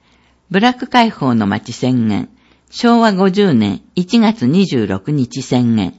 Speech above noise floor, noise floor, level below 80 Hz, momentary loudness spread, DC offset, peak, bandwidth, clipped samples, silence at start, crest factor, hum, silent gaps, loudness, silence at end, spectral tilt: 40 dB; -53 dBFS; -54 dBFS; 7 LU; under 0.1%; 0 dBFS; 8 kHz; under 0.1%; 0.5 s; 14 dB; none; none; -14 LUFS; 0.05 s; -6.5 dB/octave